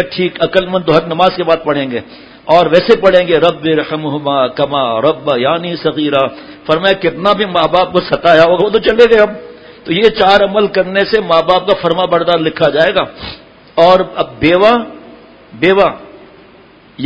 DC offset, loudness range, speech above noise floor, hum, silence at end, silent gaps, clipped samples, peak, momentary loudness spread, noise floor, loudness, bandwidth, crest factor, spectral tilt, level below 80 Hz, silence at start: under 0.1%; 3 LU; 30 dB; none; 0 s; none; 0.6%; 0 dBFS; 9 LU; -41 dBFS; -11 LUFS; 8 kHz; 12 dB; -6.5 dB/octave; -42 dBFS; 0 s